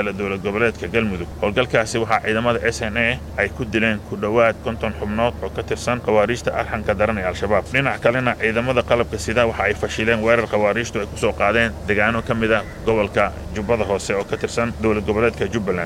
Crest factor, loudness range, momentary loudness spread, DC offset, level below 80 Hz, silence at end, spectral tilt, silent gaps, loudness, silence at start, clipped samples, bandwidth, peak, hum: 18 dB; 2 LU; 6 LU; under 0.1%; -36 dBFS; 0 s; -5.5 dB/octave; none; -20 LUFS; 0 s; under 0.1%; 16 kHz; -2 dBFS; none